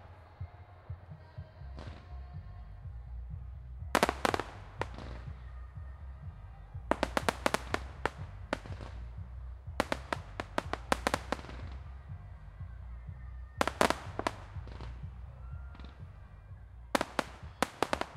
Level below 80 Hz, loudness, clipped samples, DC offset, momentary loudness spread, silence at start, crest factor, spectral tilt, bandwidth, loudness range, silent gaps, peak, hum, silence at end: -48 dBFS; -38 LUFS; under 0.1%; under 0.1%; 17 LU; 0 s; 34 dB; -4.5 dB/octave; 16 kHz; 4 LU; none; -4 dBFS; none; 0 s